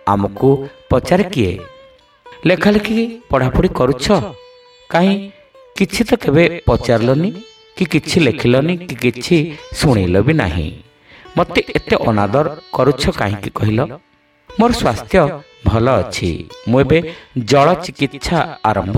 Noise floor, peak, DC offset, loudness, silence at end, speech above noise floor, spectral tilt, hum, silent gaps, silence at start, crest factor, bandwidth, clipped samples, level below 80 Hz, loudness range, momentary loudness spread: -45 dBFS; 0 dBFS; under 0.1%; -15 LUFS; 0 s; 31 dB; -6.5 dB/octave; none; none; 0.05 s; 16 dB; 16 kHz; under 0.1%; -34 dBFS; 2 LU; 9 LU